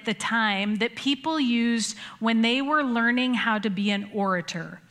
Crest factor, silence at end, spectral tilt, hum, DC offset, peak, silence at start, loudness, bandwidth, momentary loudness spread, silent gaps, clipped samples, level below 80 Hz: 16 dB; 0.1 s; -4 dB/octave; none; under 0.1%; -8 dBFS; 0 s; -24 LUFS; 12 kHz; 6 LU; none; under 0.1%; -72 dBFS